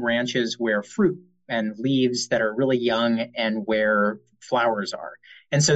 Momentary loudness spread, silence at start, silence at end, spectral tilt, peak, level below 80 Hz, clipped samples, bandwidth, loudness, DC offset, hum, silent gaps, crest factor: 8 LU; 0 s; 0 s; -4.5 dB/octave; -8 dBFS; -64 dBFS; under 0.1%; 9.2 kHz; -23 LUFS; under 0.1%; none; none; 16 dB